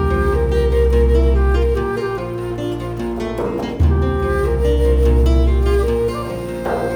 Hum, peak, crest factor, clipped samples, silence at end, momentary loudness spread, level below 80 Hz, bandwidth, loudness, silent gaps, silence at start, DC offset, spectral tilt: none; -4 dBFS; 12 dB; under 0.1%; 0 s; 9 LU; -18 dBFS; 9.8 kHz; -18 LUFS; none; 0 s; under 0.1%; -8 dB/octave